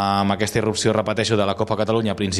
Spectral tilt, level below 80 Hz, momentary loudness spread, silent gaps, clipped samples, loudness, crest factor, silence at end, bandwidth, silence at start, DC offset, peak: -5 dB/octave; -50 dBFS; 2 LU; none; under 0.1%; -20 LUFS; 16 dB; 0 s; 13.5 kHz; 0 s; under 0.1%; -4 dBFS